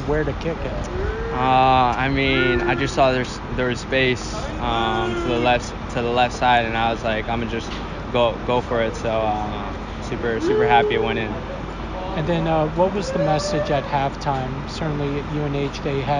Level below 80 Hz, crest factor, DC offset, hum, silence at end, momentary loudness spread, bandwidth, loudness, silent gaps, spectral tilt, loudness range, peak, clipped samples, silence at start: -34 dBFS; 16 dB; under 0.1%; none; 0 s; 10 LU; 10.5 kHz; -21 LUFS; none; -5.5 dB/octave; 3 LU; -4 dBFS; under 0.1%; 0 s